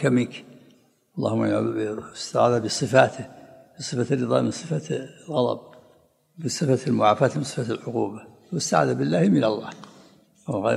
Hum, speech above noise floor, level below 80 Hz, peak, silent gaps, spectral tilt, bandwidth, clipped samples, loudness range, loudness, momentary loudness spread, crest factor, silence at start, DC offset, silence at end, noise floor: none; 36 dB; -68 dBFS; -2 dBFS; none; -5.5 dB/octave; 14 kHz; under 0.1%; 3 LU; -24 LUFS; 15 LU; 24 dB; 0 s; under 0.1%; 0 s; -59 dBFS